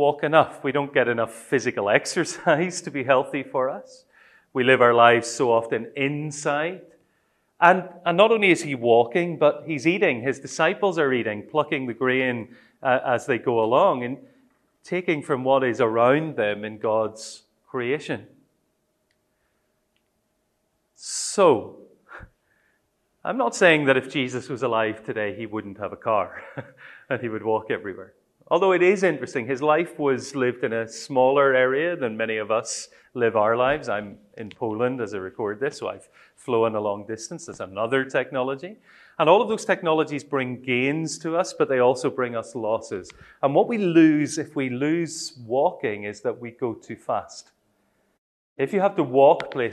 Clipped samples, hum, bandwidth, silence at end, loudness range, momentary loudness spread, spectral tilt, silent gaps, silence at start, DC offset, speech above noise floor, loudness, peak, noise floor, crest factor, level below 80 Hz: under 0.1%; none; 12.5 kHz; 0 s; 7 LU; 14 LU; -5 dB/octave; 48.18-48.56 s; 0 s; under 0.1%; 49 dB; -23 LUFS; 0 dBFS; -72 dBFS; 22 dB; -68 dBFS